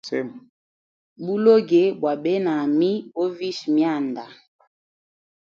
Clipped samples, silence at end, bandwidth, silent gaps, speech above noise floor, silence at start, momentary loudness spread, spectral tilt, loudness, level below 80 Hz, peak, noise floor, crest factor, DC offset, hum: under 0.1%; 1.05 s; 7.4 kHz; 0.49-1.16 s; over 69 dB; 0.05 s; 12 LU; -7 dB/octave; -21 LUFS; -74 dBFS; -4 dBFS; under -90 dBFS; 18 dB; under 0.1%; none